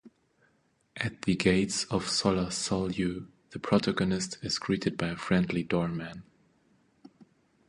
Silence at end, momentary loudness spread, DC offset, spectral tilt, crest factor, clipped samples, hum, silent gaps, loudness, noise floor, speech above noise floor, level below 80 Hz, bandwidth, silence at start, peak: 1.45 s; 13 LU; under 0.1%; -4.5 dB/octave; 22 dB; under 0.1%; none; none; -29 LUFS; -70 dBFS; 41 dB; -54 dBFS; 11.5 kHz; 0.05 s; -10 dBFS